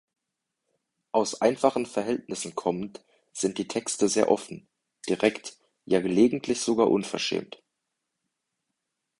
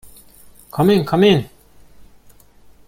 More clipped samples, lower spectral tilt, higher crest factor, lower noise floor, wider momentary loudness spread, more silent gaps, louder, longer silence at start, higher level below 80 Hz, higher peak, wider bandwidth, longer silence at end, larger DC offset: neither; second, -4 dB/octave vs -7 dB/octave; about the same, 22 dB vs 18 dB; first, -84 dBFS vs -47 dBFS; about the same, 17 LU vs 16 LU; neither; second, -26 LUFS vs -15 LUFS; first, 1.15 s vs 0.75 s; second, -66 dBFS vs -50 dBFS; second, -6 dBFS vs -2 dBFS; second, 11.5 kHz vs 16.5 kHz; first, 1.75 s vs 1.4 s; neither